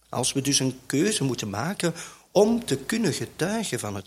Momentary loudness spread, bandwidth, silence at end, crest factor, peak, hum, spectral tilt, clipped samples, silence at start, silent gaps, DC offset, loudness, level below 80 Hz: 7 LU; 16.5 kHz; 0.05 s; 18 dB; -6 dBFS; none; -4 dB/octave; under 0.1%; 0.1 s; none; under 0.1%; -25 LUFS; -60 dBFS